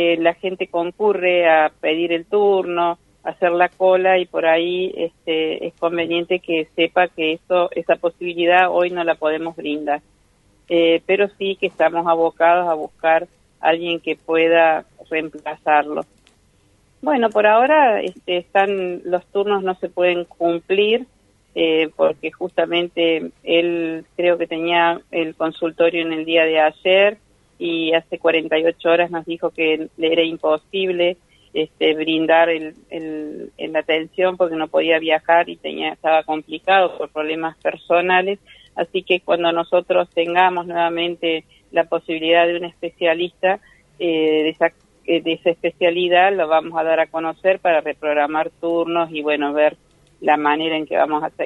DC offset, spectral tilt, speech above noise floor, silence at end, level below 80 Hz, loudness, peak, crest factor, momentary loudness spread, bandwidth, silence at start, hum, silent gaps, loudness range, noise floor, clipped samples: under 0.1%; -6 dB/octave; 39 dB; 0 s; -62 dBFS; -19 LUFS; 0 dBFS; 18 dB; 9 LU; 6.6 kHz; 0 s; none; none; 2 LU; -57 dBFS; under 0.1%